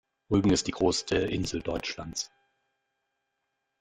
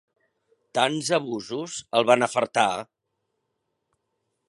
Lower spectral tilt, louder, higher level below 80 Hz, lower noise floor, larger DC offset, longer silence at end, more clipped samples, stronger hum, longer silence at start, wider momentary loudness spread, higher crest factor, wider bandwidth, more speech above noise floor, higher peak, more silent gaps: about the same, -4.5 dB/octave vs -3.5 dB/octave; second, -29 LUFS vs -24 LUFS; first, -50 dBFS vs -72 dBFS; about the same, -81 dBFS vs -78 dBFS; neither; about the same, 1.55 s vs 1.65 s; neither; neither; second, 0.3 s vs 0.75 s; about the same, 11 LU vs 11 LU; about the same, 20 dB vs 24 dB; first, 13.5 kHz vs 11.5 kHz; about the same, 53 dB vs 55 dB; second, -12 dBFS vs -2 dBFS; neither